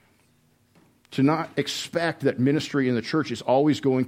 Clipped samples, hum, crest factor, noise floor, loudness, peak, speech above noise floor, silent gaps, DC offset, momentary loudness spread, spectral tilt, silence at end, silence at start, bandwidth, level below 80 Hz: under 0.1%; none; 16 dB; -63 dBFS; -24 LUFS; -8 dBFS; 40 dB; none; under 0.1%; 6 LU; -6 dB/octave; 0 s; 1.1 s; 15.5 kHz; -68 dBFS